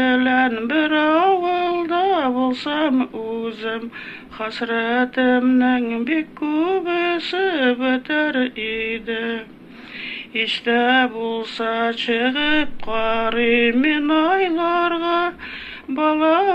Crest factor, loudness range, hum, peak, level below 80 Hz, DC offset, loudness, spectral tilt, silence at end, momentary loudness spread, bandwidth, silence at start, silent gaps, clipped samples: 14 dB; 4 LU; none; -6 dBFS; -50 dBFS; under 0.1%; -19 LUFS; -5 dB/octave; 0 s; 11 LU; 8.2 kHz; 0 s; none; under 0.1%